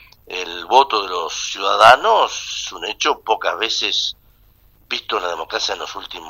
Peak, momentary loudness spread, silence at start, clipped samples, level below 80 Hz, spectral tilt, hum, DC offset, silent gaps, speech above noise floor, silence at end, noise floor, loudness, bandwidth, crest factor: 0 dBFS; 15 LU; 0.3 s; under 0.1%; -54 dBFS; -0.5 dB/octave; none; under 0.1%; none; 35 dB; 0 s; -52 dBFS; -17 LUFS; 16 kHz; 18 dB